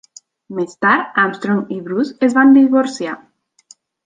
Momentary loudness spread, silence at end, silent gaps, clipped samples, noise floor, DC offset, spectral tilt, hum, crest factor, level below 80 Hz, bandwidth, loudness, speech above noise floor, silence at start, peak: 16 LU; 0.9 s; none; under 0.1%; -49 dBFS; under 0.1%; -6 dB/octave; none; 14 dB; -64 dBFS; 9.2 kHz; -15 LUFS; 35 dB; 0.5 s; -2 dBFS